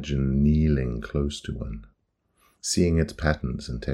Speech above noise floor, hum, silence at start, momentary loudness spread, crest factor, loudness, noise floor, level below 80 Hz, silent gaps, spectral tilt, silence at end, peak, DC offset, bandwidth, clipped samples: 46 dB; none; 0 s; 13 LU; 20 dB; -25 LUFS; -70 dBFS; -34 dBFS; none; -6 dB/octave; 0 s; -6 dBFS; under 0.1%; 13 kHz; under 0.1%